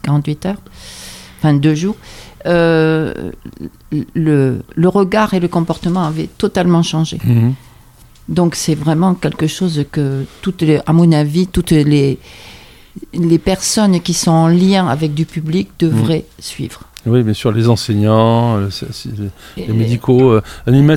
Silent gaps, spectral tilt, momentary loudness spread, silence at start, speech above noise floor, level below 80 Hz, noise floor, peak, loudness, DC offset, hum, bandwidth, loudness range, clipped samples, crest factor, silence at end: none; -6.5 dB/octave; 15 LU; 0.05 s; 29 dB; -38 dBFS; -42 dBFS; 0 dBFS; -14 LUFS; under 0.1%; none; 15.5 kHz; 2 LU; under 0.1%; 14 dB; 0 s